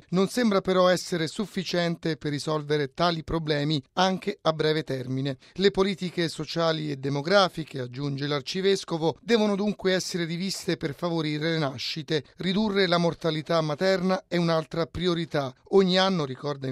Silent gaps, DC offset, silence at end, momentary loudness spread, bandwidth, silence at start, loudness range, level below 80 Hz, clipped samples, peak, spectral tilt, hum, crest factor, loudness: none; under 0.1%; 0 s; 8 LU; 14 kHz; 0.1 s; 2 LU; -56 dBFS; under 0.1%; -6 dBFS; -5.5 dB/octave; none; 20 dB; -26 LUFS